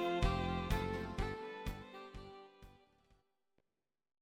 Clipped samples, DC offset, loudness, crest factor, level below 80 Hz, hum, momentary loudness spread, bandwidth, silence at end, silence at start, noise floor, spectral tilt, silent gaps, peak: under 0.1%; under 0.1%; -40 LUFS; 22 dB; -48 dBFS; none; 19 LU; 16.5 kHz; 1.5 s; 0 s; under -90 dBFS; -6 dB/octave; none; -20 dBFS